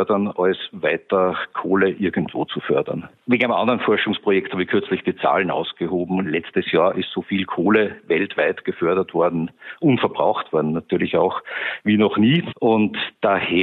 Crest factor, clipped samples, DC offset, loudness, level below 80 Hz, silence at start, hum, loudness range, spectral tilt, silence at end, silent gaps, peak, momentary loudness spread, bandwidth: 16 dB; under 0.1%; under 0.1%; -20 LUFS; -62 dBFS; 0 s; none; 1 LU; -9 dB/octave; 0 s; none; -4 dBFS; 6 LU; 4.3 kHz